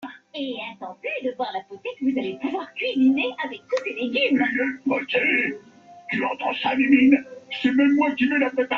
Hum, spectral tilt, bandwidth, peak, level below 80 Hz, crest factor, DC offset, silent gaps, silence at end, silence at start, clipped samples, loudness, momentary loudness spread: none; -5.5 dB/octave; 6.8 kHz; -4 dBFS; -68 dBFS; 18 dB; under 0.1%; none; 0 s; 0 s; under 0.1%; -22 LUFS; 14 LU